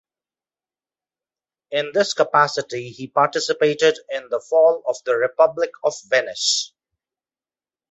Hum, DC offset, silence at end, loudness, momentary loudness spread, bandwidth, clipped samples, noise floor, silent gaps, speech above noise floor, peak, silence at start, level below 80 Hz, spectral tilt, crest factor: none; under 0.1%; 1.25 s; -20 LUFS; 10 LU; 8.4 kHz; under 0.1%; under -90 dBFS; none; over 70 dB; -2 dBFS; 1.7 s; -72 dBFS; -2.5 dB/octave; 20 dB